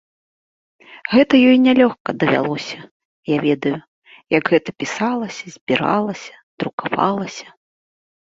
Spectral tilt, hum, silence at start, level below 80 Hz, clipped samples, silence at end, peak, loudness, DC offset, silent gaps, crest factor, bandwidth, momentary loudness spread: -5.5 dB/octave; none; 0.9 s; -60 dBFS; under 0.1%; 0.95 s; -2 dBFS; -18 LUFS; under 0.1%; 2.00-2.05 s, 2.91-3.23 s, 3.88-4.02 s, 5.61-5.67 s, 6.43-6.58 s, 6.73-6.78 s; 18 dB; 7.6 kHz; 19 LU